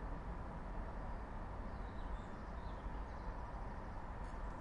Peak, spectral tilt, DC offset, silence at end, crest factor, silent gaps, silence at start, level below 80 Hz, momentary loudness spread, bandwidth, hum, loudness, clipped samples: -34 dBFS; -7.5 dB/octave; under 0.1%; 0 s; 12 dB; none; 0 s; -48 dBFS; 1 LU; 10 kHz; none; -49 LUFS; under 0.1%